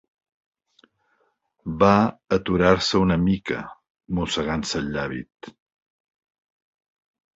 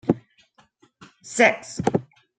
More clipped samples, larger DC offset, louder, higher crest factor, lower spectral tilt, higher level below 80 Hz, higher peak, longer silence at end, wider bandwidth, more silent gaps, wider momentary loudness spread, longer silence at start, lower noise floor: neither; neither; about the same, -22 LUFS vs -22 LUFS; about the same, 22 dB vs 24 dB; about the same, -5.5 dB/octave vs -5 dB/octave; first, -46 dBFS vs -60 dBFS; about the same, -2 dBFS vs -2 dBFS; first, 1.85 s vs 0.4 s; second, 8 kHz vs 9.4 kHz; first, 3.90-3.95 s vs none; first, 16 LU vs 10 LU; first, 1.65 s vs 0.05 s; first, -69 dBFS vs -60 dBFS